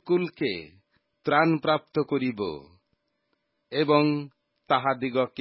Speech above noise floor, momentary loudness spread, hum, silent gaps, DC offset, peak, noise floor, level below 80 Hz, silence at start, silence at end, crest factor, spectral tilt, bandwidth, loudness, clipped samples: 51 dB; 12 LU; none; none; under 0.1%; -8 dBFS; -76 dBFS; -66 dBFS; 0.05 s; 0 s; 20 dB; -10.5 dB/octave; 5.8 kHz; -26 LUFS; under 0.1%